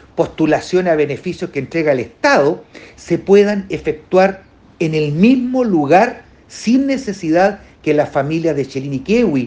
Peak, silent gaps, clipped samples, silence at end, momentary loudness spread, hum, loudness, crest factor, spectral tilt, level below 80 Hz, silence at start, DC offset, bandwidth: 0 dBFS; none; under 0.1%; 0 s; 11 LU; none; -15 LUFS; 16 dB; -6.5 dB/octave; -48 dBFS; 0.15 s; under 0.1%; 9.4 kHz